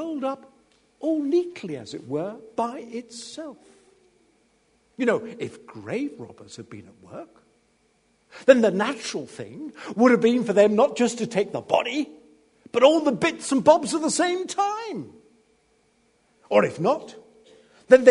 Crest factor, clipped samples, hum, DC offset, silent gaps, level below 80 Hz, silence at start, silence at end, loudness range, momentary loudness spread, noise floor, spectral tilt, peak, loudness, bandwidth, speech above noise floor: 24 dB; under 0.1%; none; under 0.1%; none; -70 dBFS; 0 s; 0 s; 11 LU; 23 LU; -65 dBFS; -4.5 dB/octave; 0 dBFS; -23 LUFS; 11 kHz; 42 dB